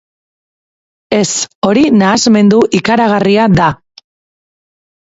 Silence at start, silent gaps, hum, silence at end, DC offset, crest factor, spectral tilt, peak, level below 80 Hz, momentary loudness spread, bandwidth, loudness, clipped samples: 1.1 s; 1.55-1.62 s; none; 1.3 s; under 0.1%; 12 dB; -5 dB/octave; 0 dBFS; -42 dBFS; 6 LU; 8 kHz; -10 LUFS; under 0.1%